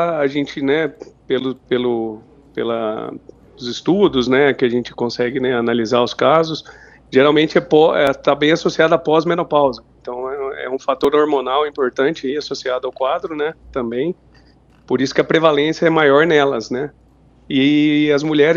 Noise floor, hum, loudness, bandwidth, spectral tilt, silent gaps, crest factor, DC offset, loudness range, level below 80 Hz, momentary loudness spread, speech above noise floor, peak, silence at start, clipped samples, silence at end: -50 dBFS; none; -17 LUFS; 7.4 kHz; -5.5 dB/octave; none; 16 dB; under 0.1%; 6 LU; -52 dBFS; 12 LU; 33 dB; 0 dBFS; 0 s; under 0.1%; 0 s